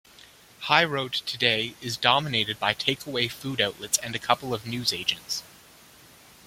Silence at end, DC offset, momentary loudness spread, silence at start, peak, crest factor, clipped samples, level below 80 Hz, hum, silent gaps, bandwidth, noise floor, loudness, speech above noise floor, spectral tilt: 1 s; under 0.1%; 9 LU; 0.6 s; -2 dBFS; 26 dB; under 0.1%; -62 dBFS; none; none; 16.5 kHz; -52 dBFS; -25 LUFS; 26 dB; -2.5 dB/octave